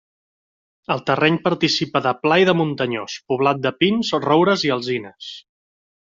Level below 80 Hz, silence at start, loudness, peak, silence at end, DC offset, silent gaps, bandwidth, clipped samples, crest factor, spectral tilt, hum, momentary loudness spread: -60 dBFS; 0.9 s; -19 LUFS; -2 dBFS; 0.8 s; under 0.1%; none; 7.6 kHz; under 0.1%; 18 dB; -5.5 dB/octave; none; 13 LU